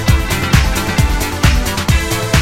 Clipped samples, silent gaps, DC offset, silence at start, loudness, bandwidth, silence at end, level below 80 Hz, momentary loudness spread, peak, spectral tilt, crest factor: under 0.1%; none; under 0.1%; 0 s; -14 LUFS; 17 kHz; 0 s; -18 dBFS; 2 LU; 0 dBFS; -4.5 dB/octave; 14 dB